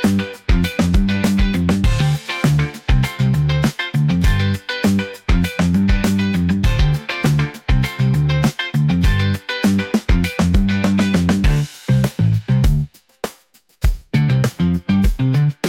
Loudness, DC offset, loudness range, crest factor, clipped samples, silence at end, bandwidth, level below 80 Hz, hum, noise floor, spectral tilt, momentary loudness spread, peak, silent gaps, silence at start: -17 LUFS; under 0.1%; 2 LU; 12 dB; under 0.1%; 0 s; 16.5 kHz; -22 dBFS; none; -52 dBFS; -6.5 dB/octave; 4 LU; -4 dBFS; none; 0 s